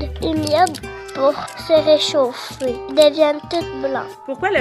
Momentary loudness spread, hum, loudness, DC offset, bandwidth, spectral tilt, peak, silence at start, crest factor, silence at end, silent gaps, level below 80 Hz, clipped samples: 12 LU; none; -18 LUFS; under 0.1%; 13 kHz; -4 dB/octave; 0 dBFS; 0 s; 18 dB; 0 s; none; -40 dBFS; under 0.1%